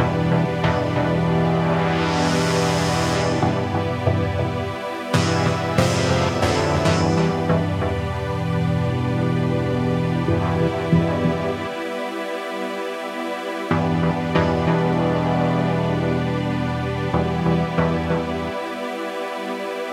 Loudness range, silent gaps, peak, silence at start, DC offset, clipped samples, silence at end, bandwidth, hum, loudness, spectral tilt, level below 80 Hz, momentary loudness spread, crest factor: 3 LU; none; -4 dBFS; 0 s; under 0.1%; under 0.1%; 0 s; 13.5 kHz; none; -21 LUFS; -6.5 dB/octave; -40 dBFS; 8 LU; 18 dB